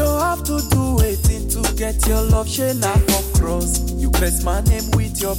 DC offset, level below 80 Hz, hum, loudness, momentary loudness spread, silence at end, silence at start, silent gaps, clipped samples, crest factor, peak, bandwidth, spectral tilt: under 0.1%; -20 dBFS; none; -18 LUFS; 4 LU; 0 s; 0 s; none; under 0.1%; 12 dB; -6 dBFS; 17 kHz; -5 dB/octave